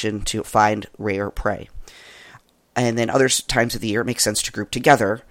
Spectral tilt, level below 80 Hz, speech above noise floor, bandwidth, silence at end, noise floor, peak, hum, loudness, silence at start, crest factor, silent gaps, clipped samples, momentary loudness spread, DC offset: -3.5 dB/octave; -40 dBFS; 29 dB; 16.5 kHz; 0.1 s; -50 dBFS; 0 dBFS; none; -20 LUFS; 0 s; 20 dB; none; under 0.1%; 9 LU; under 0.1%